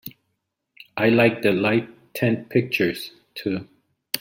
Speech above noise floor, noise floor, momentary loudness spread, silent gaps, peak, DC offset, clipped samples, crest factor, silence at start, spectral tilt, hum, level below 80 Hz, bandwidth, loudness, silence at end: 56 dB; -77 dBFS; 18 LU; none; -4 dBFS; under 0.1%; under 0.1%; 20 dB; 0.05 s; -6 dB/octave; none; -64 dBFS; 16.5 kHz; -22 LUFS; 0 s